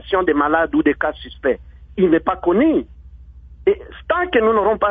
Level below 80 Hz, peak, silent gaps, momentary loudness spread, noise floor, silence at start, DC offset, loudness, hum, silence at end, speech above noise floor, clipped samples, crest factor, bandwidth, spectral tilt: -40 dBFS; -2 dBFS; none; 8 LU; -40 dBFS; 0.05 s; under 0.1%; -18 LUFS; none; 0 s; 23 dB; under 0.1%; 16 dB; 3.9 kHz; -9 dB/octave